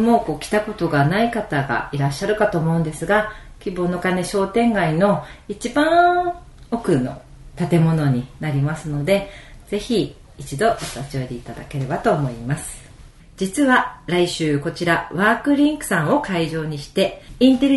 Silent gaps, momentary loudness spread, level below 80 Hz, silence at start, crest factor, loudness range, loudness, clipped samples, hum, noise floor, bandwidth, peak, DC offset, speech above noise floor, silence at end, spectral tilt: none; 12 LU; -44 dBFS; 0 s; 18 dB; 5 LU; -20 LUFS; under 0.1%; none; -44 dBFS; 12 kHz; -2 dBFS; under 0.1%; 24 dB; 0 s; -6 dB/octave